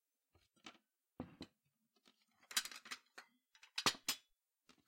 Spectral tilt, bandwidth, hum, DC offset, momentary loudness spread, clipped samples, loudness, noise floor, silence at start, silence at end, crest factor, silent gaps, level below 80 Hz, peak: -0.5 dB/octave; 16.5 kHz; none; under 0.1%; 23 LU; under 0.1%; -42 LUFS; -84 dBFS; 0.65 s; 0.7 s; 30 dB; none; -82 dBFS; -20 dBFS